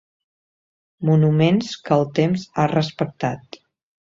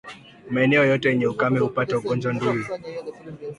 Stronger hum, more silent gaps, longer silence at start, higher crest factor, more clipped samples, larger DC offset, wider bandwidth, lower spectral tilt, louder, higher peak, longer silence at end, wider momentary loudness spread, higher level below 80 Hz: neither; neither; first, 1 s vs 0.05 s; about the same, 18 dB vs 16 dB; neither; neither; second, 7.6 kHz vs 11 kHz; about the same, -7.5 dB/octave vs -7 dB/octave; about the same, -20 LUFS vs -22 LUFS; about the same, -4 dBFS vs -6 dBFS; first, 0.65 s vs 0.05 s; second, 10 LU vs 17 LU; about the same, -58 dBFS vs -60 dBFS